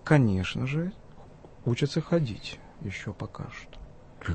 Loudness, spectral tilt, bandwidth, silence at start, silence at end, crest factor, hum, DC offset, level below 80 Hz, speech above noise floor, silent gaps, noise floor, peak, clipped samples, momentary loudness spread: -30 LUFS; -7 dB/octave; 8.8 kHz; 0 s; 0 s; 22 dB; none; under 0.1%; -52 dBFS; 21 dB; none; -48 dBFS; -8 dBFS; under 0.1%; 16 LU